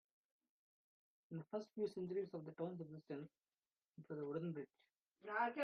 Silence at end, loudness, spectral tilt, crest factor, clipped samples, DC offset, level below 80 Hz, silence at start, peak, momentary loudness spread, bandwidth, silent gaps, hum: 0 s; -48 LUFS; -6 dB/octave; 20 dB; under 0.1%; under 0.1%; under -90 dBFS; 1.3 s; -28 dBFS; 16 LU; 6.4 kHz; 3.88-3.92 s; none